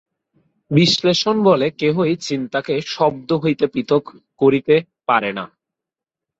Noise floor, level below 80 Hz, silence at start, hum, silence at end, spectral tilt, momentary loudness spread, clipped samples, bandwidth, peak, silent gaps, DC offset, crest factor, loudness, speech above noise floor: -87 dBFS; -60 dBFS; 0.7 s; none; 0.95 s; -5.5 dB/octave; 8 LU; under 0.1%; 8 kHz; 0 dBFS; none; under 0.1%; 18 dB; -18 LUFS; 69 dB